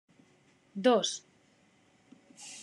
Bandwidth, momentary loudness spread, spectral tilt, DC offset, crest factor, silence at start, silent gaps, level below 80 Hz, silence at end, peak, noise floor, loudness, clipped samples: 11.5 kHz; 20 LU; -3 dB/octave; under 0.1%; 22 dB; 0.75 s; none; -88 dBFS; 0 s; -12 dBFS; -66 dBFS; -29 LUFS; under 0.1%